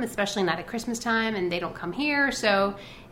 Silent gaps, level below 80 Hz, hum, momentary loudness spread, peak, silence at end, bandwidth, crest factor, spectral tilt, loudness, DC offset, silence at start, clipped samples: none; -54 dBFS; none; 8 LU; -8 dBFS; 0 s; 16 kHz; 18 dB; -4 dB/octave; -26 LUFS; under 0.1%; 0 s; under 0.1%